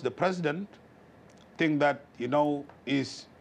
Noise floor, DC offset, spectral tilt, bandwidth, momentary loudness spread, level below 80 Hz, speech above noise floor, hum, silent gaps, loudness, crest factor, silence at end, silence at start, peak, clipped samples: -55 dBFS; under 0.1%; -6 dB/octave; 9.8 kHz; 11 LU; -72 dBFS; 26 dB; none; none; -30 LUFS; 18 dB; 0.15 s; 0 s; -14 dBFS; under 0.1%